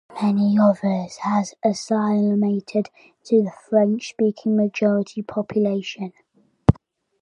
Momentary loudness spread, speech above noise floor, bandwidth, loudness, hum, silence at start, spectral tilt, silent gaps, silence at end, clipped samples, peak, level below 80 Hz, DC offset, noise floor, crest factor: 9 LU; 29 dB; 9.4 kHz; -21 LUFS; none; 0.1 s; -7.5 dB/octave; none; 0.5 s; under 0.1%; 0 dBFS; -44 dBFS; under 0.1%; -49 dBFS; 20 dB